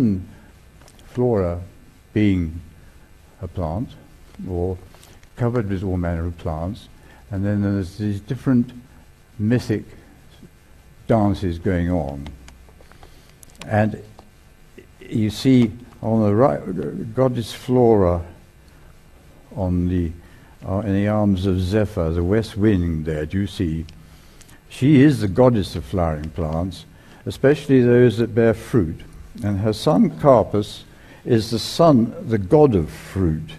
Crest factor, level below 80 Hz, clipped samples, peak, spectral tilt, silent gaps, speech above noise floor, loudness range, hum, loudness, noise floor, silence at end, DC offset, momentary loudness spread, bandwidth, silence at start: 20 dB; -40 dBFS; under 0.1%; 0 dBFS; -7.5 dB/octave; none; 29 dB; 8 LU; none; -20 LUFS; -48 dBFS; 0 s; under 0.1%; 17 LU; 13.5 kHz; 0 s